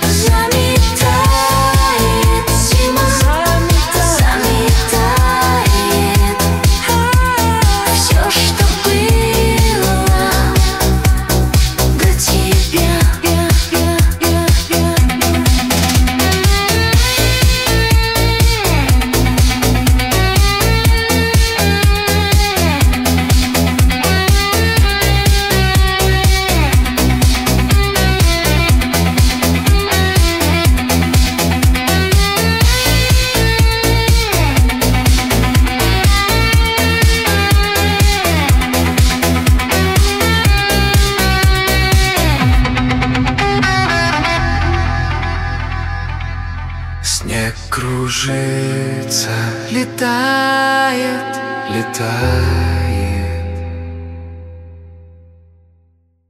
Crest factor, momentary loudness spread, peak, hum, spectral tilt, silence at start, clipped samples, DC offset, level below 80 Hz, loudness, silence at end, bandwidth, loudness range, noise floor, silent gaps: 12 dB; 6 LU; -2 dBFS; none; -4 dB/octave; 0 s; under 0.1%; under 0.1%; -16 dBFS; -13 LUFS; 1.3 s; 16.5 kHz; 5 LU; -55 dBFS; none